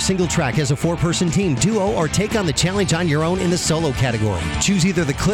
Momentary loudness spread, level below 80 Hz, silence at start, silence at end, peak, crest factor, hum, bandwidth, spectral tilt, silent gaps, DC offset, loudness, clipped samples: 2 LU; -34 dBFS; 0 s; 0 s; -6 dBFS; 12 dB; none; 16.5 kHz; -4.5 dB/octave; none; under 0.1%; -19 LUFS; under 0.1%